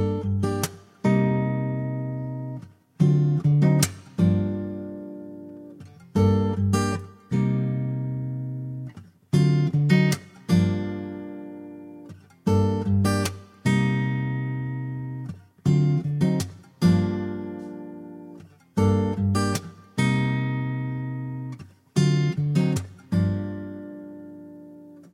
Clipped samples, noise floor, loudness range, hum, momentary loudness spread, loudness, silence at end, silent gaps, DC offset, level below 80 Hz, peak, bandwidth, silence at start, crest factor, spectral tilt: under 0.1%; -46 dBFS; 3 LU; none; 19 LU; -24 LUFS; 0.15 s; none; under 0.1%; -54 dBFS; -4 dBFS; 16 kHz; 0 s; 20 dB; -7 dB/octave